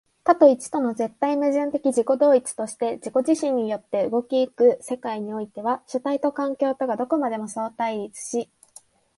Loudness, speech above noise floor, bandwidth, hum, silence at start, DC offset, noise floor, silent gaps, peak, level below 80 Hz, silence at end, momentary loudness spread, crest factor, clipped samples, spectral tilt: -23 LUFS; 30 dB; 11.5 kHz; none; 0.25 s; under 0.1%; -52 dBFS; none; -4 dBFS; -72 dBFS; 0.75 s; 11 LU; 20 dB; under 0.1%; -5 dB/octave